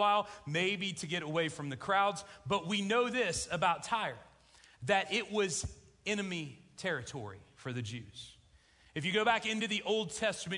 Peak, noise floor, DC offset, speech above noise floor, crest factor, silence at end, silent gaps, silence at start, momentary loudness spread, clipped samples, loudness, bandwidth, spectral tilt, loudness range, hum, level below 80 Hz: -16 dBFS; -64 dBFS; under 0.1%; 30 dB; 20 dB; 0 s; none; 0 s; 14 LU; under 0.1%; -34 LUFS; 11 kHz; -3.5 dB/octave; 6 LU; none; -64 dBFS